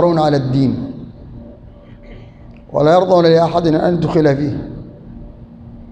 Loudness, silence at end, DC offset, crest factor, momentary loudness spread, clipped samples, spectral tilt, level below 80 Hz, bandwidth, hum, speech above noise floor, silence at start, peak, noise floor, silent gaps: -14 LUFS; 0 s; under 0.1%; 14 dB; 25 LU; under 0.1%; -8 dB/octave; -40 dBFS; 9 kHz; none; 25 dB; 0 s; -2 dBFS; -38 dBFS; none